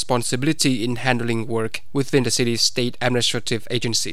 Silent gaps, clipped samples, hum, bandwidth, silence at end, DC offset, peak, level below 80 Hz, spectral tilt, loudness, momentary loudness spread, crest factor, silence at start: none; under 0.1%; none; 16 kHz; 0 s; 4%; -2 dBFS; -54 dBFS; -3.5 dB/octave; -21 LUFS; 6 LU; 20 dB; 0 s